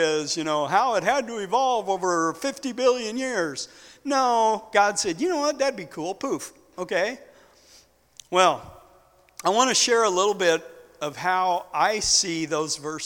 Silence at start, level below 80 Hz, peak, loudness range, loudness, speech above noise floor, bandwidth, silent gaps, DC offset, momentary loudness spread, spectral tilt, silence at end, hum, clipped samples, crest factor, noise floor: 0 s; -60 dBFS; -2 dBFS; 5 LU; -23 LUFS; 33 dB; 18 kHz; none; under 0.1%; 12 LU; -2 dB/octave; 0 s; none; under 0.1%; 22 dB; -57 dBFS